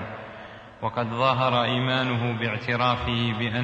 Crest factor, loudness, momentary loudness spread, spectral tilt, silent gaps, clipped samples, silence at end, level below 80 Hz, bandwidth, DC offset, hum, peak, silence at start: 18 dB; -24 LUFS; 16 LU; -7 dB/octave; none; under 0.1%; 0 s; -50 dBFS; 7.8 kHz; under 0.1%; none; -8 dBFS; 0 s